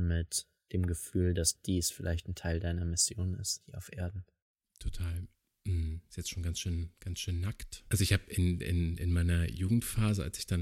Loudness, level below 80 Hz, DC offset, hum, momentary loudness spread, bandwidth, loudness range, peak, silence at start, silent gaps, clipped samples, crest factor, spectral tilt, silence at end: -34 LUFS; -44 dBFS; under 0.1%; none; 11 LU; 16.5 kHz; 7 LU; -14 dBFS; 0 s; 4.42-4.55 s; under 0.1%; 20 dB; -4.5 dB/octave; 0 s